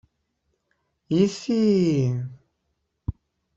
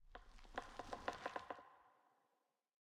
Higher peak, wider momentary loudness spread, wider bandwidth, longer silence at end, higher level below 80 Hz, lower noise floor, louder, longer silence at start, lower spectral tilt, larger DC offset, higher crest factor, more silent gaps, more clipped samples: first, -8 dBFS vs -28 dBFS; about the same, 16 LU vs 15 LU; second, 8 kHz vs 14 kHz; second, 0.45 s vs 0.9 s; first, -50 dBFS vs -68 dBFS; second, -76 dBFS vs -86 dBFS; first, -22 LUFS vs -51 LUFS; first, 1.1 s vs 0 s; first, -7.5 dB/octave vs -3.5 dB/octave; neither; second, 18 dB vs 26 dB; neither; neither